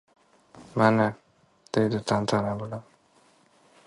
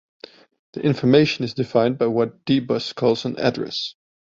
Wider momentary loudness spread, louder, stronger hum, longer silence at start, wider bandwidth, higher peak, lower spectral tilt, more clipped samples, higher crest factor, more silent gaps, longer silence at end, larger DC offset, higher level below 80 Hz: first, 13 LU vs 10 LU; second, -26 LUFS vs -21 LUFS; neither; second, 0.55 s vs 0.75 s; first, 11.5 kHz vs 7.6 kHz; second, -6 dBFS vs -2 dBFS; about the same, -6.5 dB/octave vs -6.5 dB/octave; neither; about the same, 22 dB vs 20 dB; neither; first, 1.05 s vs 0.4 s; neither; about the same, -60 dBFS vs -58 dBFS